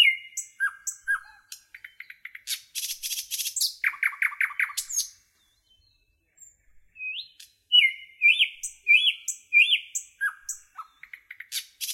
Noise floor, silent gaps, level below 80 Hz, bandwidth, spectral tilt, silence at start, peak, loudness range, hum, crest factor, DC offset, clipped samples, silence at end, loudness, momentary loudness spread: -68 dBFS; none; -74 dBFS; 16.5 kHz; 7 dB/octave; 0 s; -8 dBFS; 10 LU; none; 20 dB; under 0.1%; under 0.1%; 0 s; -24 LUFS; 25 LU